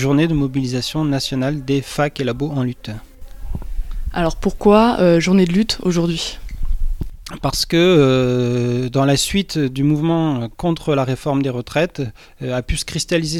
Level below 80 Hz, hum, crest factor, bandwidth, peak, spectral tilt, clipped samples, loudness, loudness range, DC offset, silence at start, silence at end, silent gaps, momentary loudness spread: -30 dBFS; none; 18 dB; 16.5 kHz; 0 dBFS; -5.5 dB/octave; under 0.1%; -18 LUFS; 5 LU; under 0.1%; 0 s; 0 s; none; 16 LU